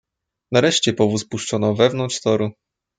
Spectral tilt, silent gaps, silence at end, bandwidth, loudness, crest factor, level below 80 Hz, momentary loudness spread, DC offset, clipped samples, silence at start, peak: -4.5 dB/octave; none; 0.45 s; 9.6 kHz; -19 LUFS; 18 dB; -62 dBFS; 7 LU; under 0.1%; under 0.1%; 0.5 s; -2 dBFS